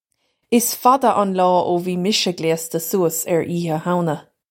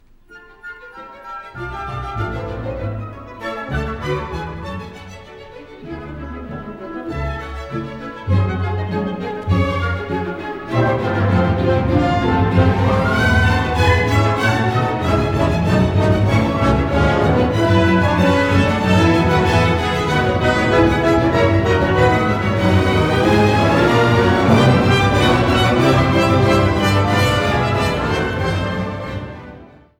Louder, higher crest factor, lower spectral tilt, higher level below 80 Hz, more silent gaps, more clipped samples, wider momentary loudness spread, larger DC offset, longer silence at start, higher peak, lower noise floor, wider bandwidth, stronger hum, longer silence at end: second, -19 LUFS vs -16 LUFS; about the same, 18 dB vs 14 dB; second, -4.5 dB/octave vs -6.5 dB/octave; second, -66 dBFS vs -30 dBFS; neither; neither; second, 7 LU vs 16 LU; neither; first, 0.5 s vs 0.3 s; about the same, 0 dBFS vs -2 dBFS; first, -70 dBFS vs -44 dBFS; first, 16.5 kHz vs 14 kHz; neither; about the same, 0.3 s vs 0.35 s